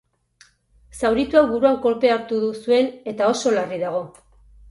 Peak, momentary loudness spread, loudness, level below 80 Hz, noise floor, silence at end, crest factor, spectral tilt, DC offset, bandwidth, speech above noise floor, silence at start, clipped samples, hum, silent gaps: -2 dBFS; 8 LU; -20 LUFS; -52 dBFS; -56 dBFS; 0.6 s; 18 dB; -4.5 dB/octave; under 0.1%; 11.5 kHz; 37 dB; 0.95 s; under 0.1%; none; none